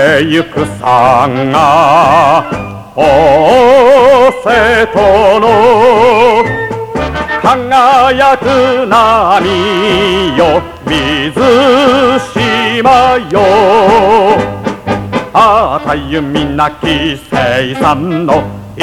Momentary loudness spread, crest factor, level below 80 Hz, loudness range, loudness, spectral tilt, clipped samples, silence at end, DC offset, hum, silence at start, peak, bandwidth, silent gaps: 8 LU; 8 dB; -32 dBFS; 5 LU; -8 LUFS; -5.5 dB/octave; 0.8%; 0 s; 0.4%; none; 0 s; 0 dBFS; 16 kHz; none